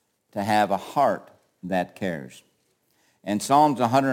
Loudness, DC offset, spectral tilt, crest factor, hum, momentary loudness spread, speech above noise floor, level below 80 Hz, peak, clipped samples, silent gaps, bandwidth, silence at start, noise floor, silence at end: -23 LUFS; under 0.1%; -5.5 dB/octave; 18 dB; none; 17 LU; 46 dB; -70 dBFS; -6 dBFS; under 0.1%; none; 17 kHz; 0.35 s; -68 dBFS; 0 s